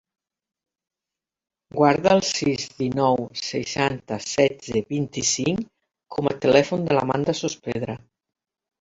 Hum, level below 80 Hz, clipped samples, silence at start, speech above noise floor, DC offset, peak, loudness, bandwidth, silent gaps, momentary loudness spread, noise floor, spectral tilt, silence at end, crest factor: none; -56 dBFS; under 0.1%; 1.75 s; 66 dB; under 0.1%; -2 dBFS; -23 LUFS; 8 kHz; none; 11 LU; -89 dBFS; -4.5 dB/octave; 0.85 s; 22 dB